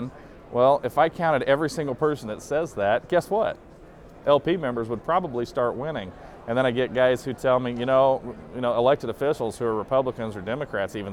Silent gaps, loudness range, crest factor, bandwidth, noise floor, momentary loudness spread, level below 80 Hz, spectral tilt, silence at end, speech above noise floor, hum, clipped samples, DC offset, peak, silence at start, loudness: none; 2 LU; 20 dB; 15.5 kHz; -46 dBFS; 10 LU; -52 dBFS; -6 dB/octave; 0 s; 22 dB; none; under 0.1%; under 0.1%; -6 dBFS; 0 s; -24 LUFS